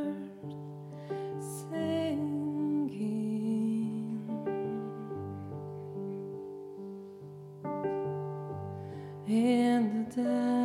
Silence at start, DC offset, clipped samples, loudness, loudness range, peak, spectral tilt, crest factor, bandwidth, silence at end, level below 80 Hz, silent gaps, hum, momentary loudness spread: 0 s; under 0.1%; under 0.1%; -34 LUFS; 7 LU; -16 dBFS; -7 dB/octave; 16 dB; 15 kHz; 0 s; -76 dBFS; none; none; 15 LU